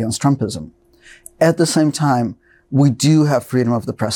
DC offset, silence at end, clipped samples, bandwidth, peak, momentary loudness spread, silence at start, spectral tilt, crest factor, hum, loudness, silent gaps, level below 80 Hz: under 0.1%; 0 s; under 0.1%; 17 kHz; -2 dBFS; 8 LU; 0 s; -6 dB/octave; 14 dB; none; -16 LUFS; none; -54 dBFS